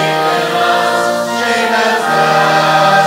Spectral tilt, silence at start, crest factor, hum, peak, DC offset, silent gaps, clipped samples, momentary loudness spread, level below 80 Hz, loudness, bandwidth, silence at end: -3.5 dB/octave; 0 s; 12 dB; none; 0 dBFS; under 0.1%; none; under 0.1%; 4 LU; -66 dBFS; -12 LUFS; 16.5 kHz; 0 s